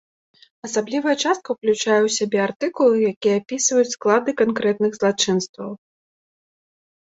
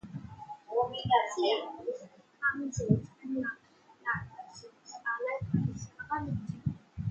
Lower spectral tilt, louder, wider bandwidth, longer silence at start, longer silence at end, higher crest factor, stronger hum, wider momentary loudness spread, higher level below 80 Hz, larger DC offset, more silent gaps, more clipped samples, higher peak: second, -3.5 dB/octave vs -5.5 dB/octave; first, -20 LUFS vs -33 LUFS; about the same, 8 kHz vs 8.6 kHz; first, 0.65 s vs 0.05 s; first, 1.25 s vs 0 s; about the same, 18 dB vs 22 dB; neither; second, 8 LU vs 18 LU; second, -66 dBFS vs -58 dBFS; neither; first, 2.56-2.60 s, 3.16-3.21 s, 5.49-5.54 s vs none; neither; first, -4 dBFS vs -12 dBFS